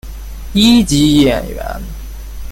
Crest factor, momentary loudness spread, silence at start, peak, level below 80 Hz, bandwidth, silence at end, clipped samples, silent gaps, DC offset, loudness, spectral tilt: 14 dB; 21 LU; 0.05 s; 0 dBFS; -26 dBFS; 17 kHz; 0 s; under 0.1%; none; under 0.1%; -11 LUFS; -5 dB/octave